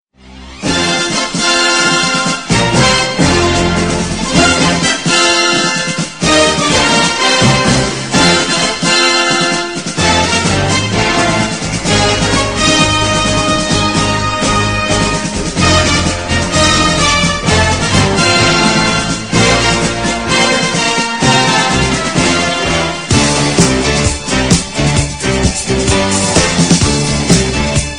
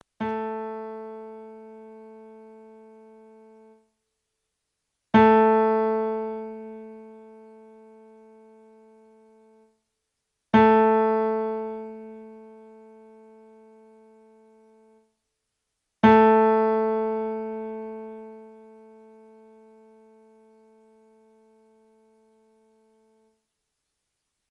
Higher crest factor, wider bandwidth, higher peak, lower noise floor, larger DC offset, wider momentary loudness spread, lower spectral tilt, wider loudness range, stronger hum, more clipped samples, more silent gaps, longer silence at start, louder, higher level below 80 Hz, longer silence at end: second, 12 dB vs 24 dB; first, 11 kHz vs 6.4 kHz; first, 0 dBFS vs -4 dBFS; second, -34 dBFS vs -81 dBFS; first, 0.7% vs under 0.1%; second, 5 LU vs 28 LU; second, -3.5 dB/octave vs -8.5 dB/octave; second, 2 LU vs 20 LU; neither; neither; neither; about the same, 0.25 s vs 0.2 s; first, -11 LUFS vs -22 LUFS; first, -26 dBFS vs -60 dBFS; second, 0 s vs 6.05 s